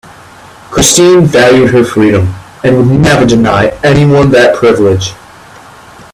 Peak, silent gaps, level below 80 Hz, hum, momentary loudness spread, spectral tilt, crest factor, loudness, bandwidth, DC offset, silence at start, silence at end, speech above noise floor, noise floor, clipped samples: 0 dBFS; none; -32 dBFS; none; 8 LU; -5 dB/octave; 8 dB; -7 LUFS; 18.5 kHz; under 0.1%; 0.7 s; 1 s; 27 dB; -33 dBFS; 0.3%